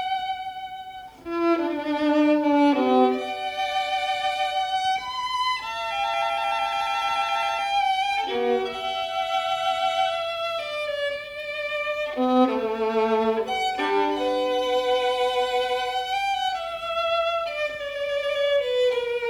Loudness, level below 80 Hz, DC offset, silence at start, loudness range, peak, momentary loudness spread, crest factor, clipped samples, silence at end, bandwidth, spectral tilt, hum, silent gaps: -24 LUFS; -60 dBFS; under 0.1%; 0 s; 3 LU; -8 dBFS; 8 LU; 16 dB; under 0.1%; 0 s; 19 kHz; -3 dB/octave; none; none